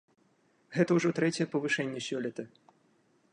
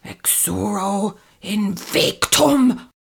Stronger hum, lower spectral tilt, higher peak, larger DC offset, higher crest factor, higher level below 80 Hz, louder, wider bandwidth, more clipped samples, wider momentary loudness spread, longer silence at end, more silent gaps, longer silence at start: neither; first, -5.5 dB/octave vs -3 dB/octave; second, -14 dBFS vs 0 dBFS; neither; about the same, 18 dB vs 18 dB; second, -76 dBFS vs -50 dBFS; second, -31 LUFS vs -18 LUFS; second, 10.5 kHz vs over 20 kHz; neither; about the same, 12 LU vs 10 LU; first, 0.85 s vs 0.15 s; neither; first, 0.7 s vs 0.05 s